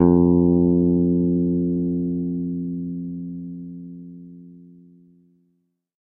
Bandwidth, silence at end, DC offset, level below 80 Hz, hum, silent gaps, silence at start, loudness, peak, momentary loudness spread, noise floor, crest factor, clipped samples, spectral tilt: 1.6 kHz; 1.4 s; under 0.1%; -46 dBFS; none; none; 0 s; -21 LUFS; -2 dBFS; 22 LU; -70 dBFS; 20 dB; under 0.1%; -15.5 dB/octave